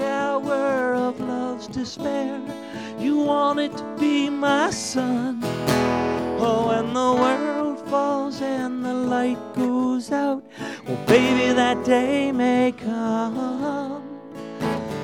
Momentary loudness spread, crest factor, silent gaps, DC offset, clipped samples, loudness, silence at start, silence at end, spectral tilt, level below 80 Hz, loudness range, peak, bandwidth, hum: 10 LU; 18 dB; none; under 0.1%; under 0.1%; -23 LUFS; 0 s; 0 s; -5 dB/octave; -54 dBFS; 4 LU; -4 dBFS; 17 kHz; none